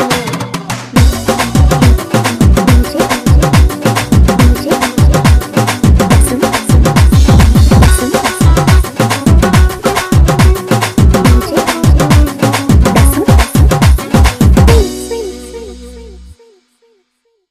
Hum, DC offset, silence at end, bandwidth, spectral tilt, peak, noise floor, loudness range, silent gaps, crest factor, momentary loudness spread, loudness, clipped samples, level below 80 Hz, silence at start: none; 0.3%; 1.2 s; 15.5 kHz; -5.5 dB/octave; 0 dBFS; -61 dBFS; 2 LU; none; 8 dB; 6 LU; -9 LUFS; under 0.1%; -12 dBFS; 0 s